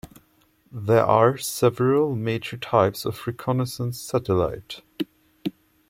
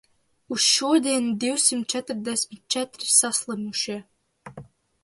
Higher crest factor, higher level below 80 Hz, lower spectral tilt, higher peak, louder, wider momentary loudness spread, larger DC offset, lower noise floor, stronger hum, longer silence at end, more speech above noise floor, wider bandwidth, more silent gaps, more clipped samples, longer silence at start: about the same, 20 dB vs 20 dB; first, -54 dBFS vs -68 dBFS; first, -6 dB/octave vs -1.5 dB/octave; about the same, -4 dBFS vs -4 dBFS; about the same, -23 LUFS vs -22 LUFS; first, 15 LU vs 10 LU; neither; first, -62 dBFS vs -46 dBFS; neither; about the same, 0.4 s vs 0.4 s; first, 40 dB vs 22 dB; first, 16.5 kHz vs 12 kHz; neither; neither; second, 0.05 s vs 0.5 s